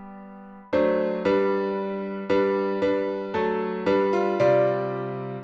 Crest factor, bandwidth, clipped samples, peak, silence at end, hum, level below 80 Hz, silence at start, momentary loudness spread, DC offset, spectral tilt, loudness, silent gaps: 14 dB; 7.2 kHz; under 0.1%; -10 dBFS; 0 s; none; -60 dBFS; 0 s; 10 LU; under 0.1%; -7.5 dB/octave; -24 LUFS; none